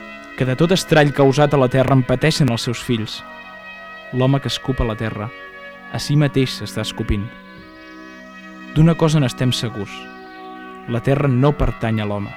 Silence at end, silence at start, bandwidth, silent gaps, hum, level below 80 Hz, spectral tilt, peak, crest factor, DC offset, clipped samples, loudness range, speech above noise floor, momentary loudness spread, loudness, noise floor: 0 s; 0 s; 15 kHz; none; none; -36 dBFS; -6 dB/octave; -2 dBFS; 18 dB; under 0.1%; under 0.1%; 7 LU; 22 dB; 21 LU; -18 LUFS; -39 dBFS